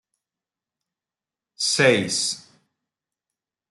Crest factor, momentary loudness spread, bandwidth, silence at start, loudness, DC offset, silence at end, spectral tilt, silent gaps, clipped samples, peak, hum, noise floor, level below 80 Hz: 22 dB; 9 LU; 12 kHz; 1.6 s; -20 LUFS; under 0.1%; 1.3 s; -2.5 dB/octave; none; under 0.1%; -4 dBFS; none; under -90 dBFS; -70 dBFS